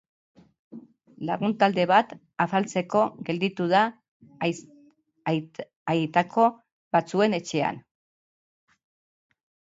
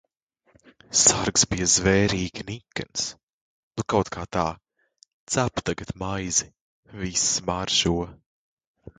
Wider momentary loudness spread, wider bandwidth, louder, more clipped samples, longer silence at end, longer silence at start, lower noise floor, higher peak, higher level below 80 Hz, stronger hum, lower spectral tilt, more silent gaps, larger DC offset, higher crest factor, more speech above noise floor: second, 12 LU vs 15 LU; second, 8 kHz vs 11 kHz; about the same, -25 LUFS vs -23 LUFS; neither; first, 1.95 s vs 0.85 s; second, 0.7 s vs 0.9 s; second, -59 dBFS vs -68 dBFS; about the same, -6 dBFS vs -4 dBFS; second, -72 dBFS vs -46 dBFS; neither; first, -6 dB/octave vs -2.5 dB/octave; second, 4.08-4.20 s, 5.76-5.86 s, 6.72-6.91 s vs 3.23-3.27 s, 3.33-3.71 s, 5.13-5.27 s, 6.61-6.83 s; neither; about the same, 22 dB vs 24 dB; second, 35 dB vs 44 dB